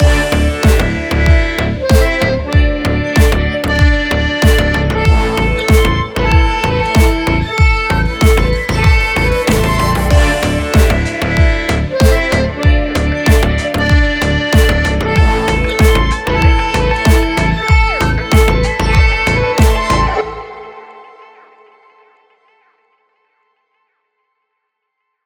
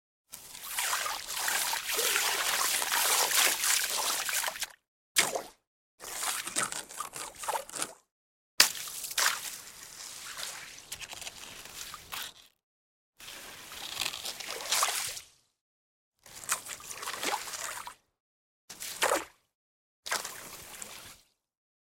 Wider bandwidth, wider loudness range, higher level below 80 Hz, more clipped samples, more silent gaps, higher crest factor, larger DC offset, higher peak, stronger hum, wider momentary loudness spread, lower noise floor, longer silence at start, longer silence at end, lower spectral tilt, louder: first, over 20 kHz vs 17 kHz; second, 2 LU vs 13 LU; first, -16 dBFS vs -70 dBFS; neither; second, none vs 4.88-5.15 s, 5.67-5.98 s, 8.12-8.58 s, 12.63-13.13 s, 15.61-16.12 s, 18.20-18.68 s, 19.55-20.03 s; second, 12 dB vs 32 dB; neither; first, 0 dBFS vs -4 dBFS; neither; second, 4 LU vs 19 LU; first, -72 dBFS vs -58 dBFS; second, 0 s vs 0.3 s; first, 4.25 s vs 0.75 s; first, -5.5 dB/octave vs 1.5 dB/octave; first, -12 LUFS vs -30 LUFS